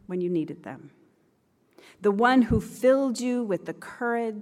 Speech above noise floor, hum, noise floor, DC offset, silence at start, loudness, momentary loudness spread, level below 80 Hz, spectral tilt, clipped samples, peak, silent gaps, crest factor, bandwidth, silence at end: 42 dB; none; -67 dBFS; under 0.1%; 0.1 s; -25 LUFS; 17 LU; -48 dBFS; -6 dB/octave; under 0.1%; -8 dBFS; none; 18 dB; 14.5 kHz; 0 s